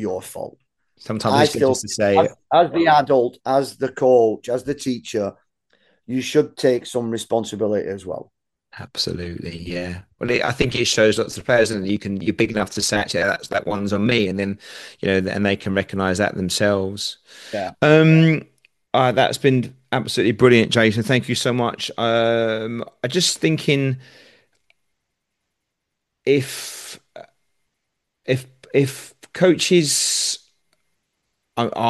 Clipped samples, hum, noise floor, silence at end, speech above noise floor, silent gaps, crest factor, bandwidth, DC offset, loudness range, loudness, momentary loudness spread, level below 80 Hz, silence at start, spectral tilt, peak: under 0.1%; none; -79 dBFS; 0 s; 60 dB; none; 20 dB; 12.5 kHz; under 0.1%; 8 LU; -19 LUFS; 14 LU; -54 dBFS; 0 s; -4.5 dB/octave; 0 dBFS